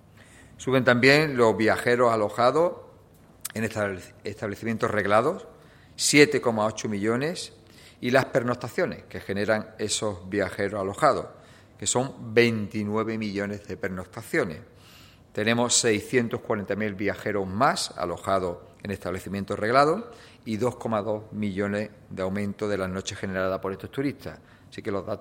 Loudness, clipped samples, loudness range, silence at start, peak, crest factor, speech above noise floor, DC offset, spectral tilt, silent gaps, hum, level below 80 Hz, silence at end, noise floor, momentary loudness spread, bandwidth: -25 LUFS; under 0.1%; 6 LU; 0.2 s; 0 dBFS; 26 dB; 28 dB; under 0.1%; -4 dB/octave; none; none; -60 dBFS; 0 s; -53 dBFS; 14 LU; 16.5 kHz